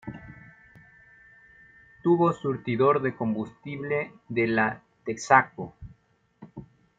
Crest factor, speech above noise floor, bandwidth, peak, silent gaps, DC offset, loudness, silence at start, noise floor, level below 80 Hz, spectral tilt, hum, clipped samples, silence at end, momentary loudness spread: 24 dB; 40 dB; 9 kHz; -4 dBFS; none; under 0.1%; -26 LUFS; 0.05 s; -65 dBFS; -62 dBFS; -6.5 dB/octave; none; under 0.1%; 0.35 s; 24 LU